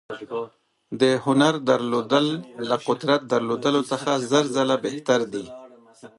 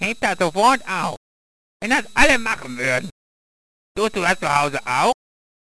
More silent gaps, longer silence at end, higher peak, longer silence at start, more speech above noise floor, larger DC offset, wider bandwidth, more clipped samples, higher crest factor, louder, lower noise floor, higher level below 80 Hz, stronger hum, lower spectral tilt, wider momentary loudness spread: second, none vs 1.17-1.80 s, 3.12-3.95 s; second, 0.1 s vs 0.5 s; second, -6 dBFS vs 0 dBFS; about the same, 0.1 s vs 0 s; second, 25 dB vs over 71 dB; second, under 0.1% vs 0.8%; about the same, 11.5 kHz vs 11 kHz; neither; about the same, 18 dB vs 22 dB; second, -22 LUFS vs -19 LUFS; second, -48 dBFS vs under -90 dBFS; second, -70 dBFS vs -40 dBFS; neither; first, -5 dB/octave vs -3.5 dB/octave; about the same, 13 LU vs 14 LU